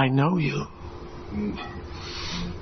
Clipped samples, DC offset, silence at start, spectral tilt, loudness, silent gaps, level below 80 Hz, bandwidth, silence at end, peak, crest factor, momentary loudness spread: under 0.1%; under 0.1%; 0 s; -6.5 dB/octave; -28 LUFS; none; -44 dBFS; 6.4 kHz; 0 s; -8 dBFS; 20 dB; 17 LU